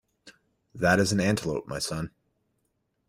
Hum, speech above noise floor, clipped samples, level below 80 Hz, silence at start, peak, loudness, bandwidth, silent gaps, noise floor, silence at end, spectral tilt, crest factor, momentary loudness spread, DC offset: none; 50 dB; under 0.1%; -56 dBFS; 0.25 s; -8 dBFS; -26 LUFS; 16 kHz; none; -76 dBFS; 1 s; -4.5 dB/octave; 22 dB; 11 LU; under 0.1%